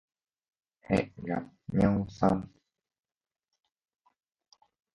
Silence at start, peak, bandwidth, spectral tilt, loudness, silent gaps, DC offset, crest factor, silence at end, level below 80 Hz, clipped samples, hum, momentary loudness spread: 0.9 s; -10 dBFS; 9.8 kHz; -8.5 dB/octave; -30 LUFS; none; under 0.1%; 24 dB; 2.5 s; -54 dBFS; under 0.1%; none; 9 LU